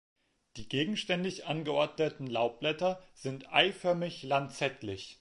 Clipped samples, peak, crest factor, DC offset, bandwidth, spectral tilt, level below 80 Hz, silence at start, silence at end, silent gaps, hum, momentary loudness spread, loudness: under 0.1%; -10 dBFS; 24 dB; under 0.1%; 11.5 kHz; -5 dB/octave; -68 dBFS; 0.55 s; 0.05 s; none; none; 13 LU; -32 LUFS